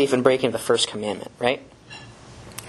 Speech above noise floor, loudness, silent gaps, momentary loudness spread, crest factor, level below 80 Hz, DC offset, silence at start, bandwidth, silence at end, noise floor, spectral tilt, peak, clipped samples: 21 dB; -22 LUFS; none; 22 LU; 24 dB; -58 dBFS; under 0.1%; 0 s; 13 kHz; 0 s; -43 dBFS; -3.5 dB/octave; 0 dBFS; under 0.1%